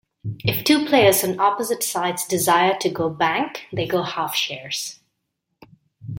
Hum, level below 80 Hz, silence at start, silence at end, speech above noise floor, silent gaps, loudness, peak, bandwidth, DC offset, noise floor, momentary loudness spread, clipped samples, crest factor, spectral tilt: none; -58 dBFS; 0.25 s; 0 s; 56 dB; none; -20 LUFS; -4 dBFS; 17 kHz; under 0.1%; -76 dBFS; 11 LU; under 0.1%; 18 dB; -3.5 dB/octave